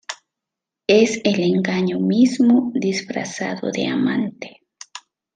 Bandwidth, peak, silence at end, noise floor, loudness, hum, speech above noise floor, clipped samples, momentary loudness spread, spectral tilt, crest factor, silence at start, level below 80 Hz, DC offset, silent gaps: 9.4 kHz; -2 dBFS; 0.35 s; -85 dBFS; -19 LUFS; none; 67 dB; under 0.1%; 22 LU; -5.5 dB/octave; 18 dB; 0.1 s; -64 dBFS; under 0.1%; none